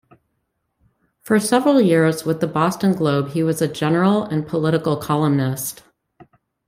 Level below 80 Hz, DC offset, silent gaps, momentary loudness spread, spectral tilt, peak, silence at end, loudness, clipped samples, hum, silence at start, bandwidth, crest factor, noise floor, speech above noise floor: -58 dBFS; under 0.1%; none; 7 LU; -6 dB/octave; -2 dBFS; 0.45 s; -19 LUFS; under 0.1%; none; 1.25 s; 16 kHz; 16 dB; -72 dBFS; 55 dB